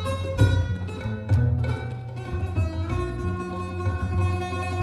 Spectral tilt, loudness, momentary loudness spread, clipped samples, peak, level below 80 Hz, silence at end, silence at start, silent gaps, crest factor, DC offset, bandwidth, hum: -7.5 dB/octave; -26 LUFS; 9 LU; under 0.1%; -8 dBFS; -36 dBFS; 0 s; 0 s; none; 18 dB; under 0.1%; 11 kHz; none